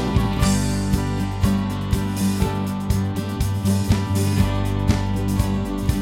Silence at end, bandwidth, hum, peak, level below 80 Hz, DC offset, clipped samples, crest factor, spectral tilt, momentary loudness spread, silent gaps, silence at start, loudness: 0 s; 17 kHz; none; -4 dBFS; -28 dBFS; under 0.1%; under 0.1%; 16 dB; -6 dB/octave; 4 LU; none; 0 s; -22 LUFS